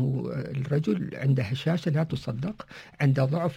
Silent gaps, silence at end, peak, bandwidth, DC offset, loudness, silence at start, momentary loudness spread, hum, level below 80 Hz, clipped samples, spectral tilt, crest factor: none; 0 s; -12 dBFS; 8.6 kHz; under 0.1%; -28 LUFS; 0 s; 9 LU; none; -58 dBFS; under 0.1%; -8 dB/octave; 14 dB